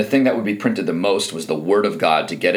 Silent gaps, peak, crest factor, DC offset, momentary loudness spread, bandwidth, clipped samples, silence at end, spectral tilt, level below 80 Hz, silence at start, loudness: none; -2 dBFS; 16 dB; under 0.1%; 4 LU; 16.5 kHz; under 0.1%; 0 s; -4.5 dB/octave; -72 dBFS; 0 s; -19 LUFS